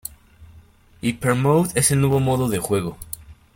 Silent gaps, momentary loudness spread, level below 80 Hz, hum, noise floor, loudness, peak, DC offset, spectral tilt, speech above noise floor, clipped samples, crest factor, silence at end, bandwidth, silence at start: none; 18 LU; -48 dBFS; none; -50 dBFS; -20 LUFS; -2 dBFS; under 0.1%; -5 dB/octave; 30 dB; under 0.1%; 20 dB; 0.2 s; 17 kHz; 0.4 s